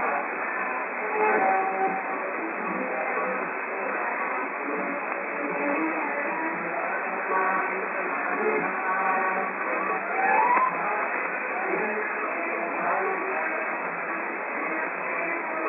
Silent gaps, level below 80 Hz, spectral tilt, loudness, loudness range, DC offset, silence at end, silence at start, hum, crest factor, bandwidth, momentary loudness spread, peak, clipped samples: none; under -90 dBFS; -9.5 dB/octave; -26 LUFS; 3 LU; under 0.1%; 0 s; 0 s; none; 16 dB; 3.8 kHz; 6 LU; -10 dBFS; under 0.1%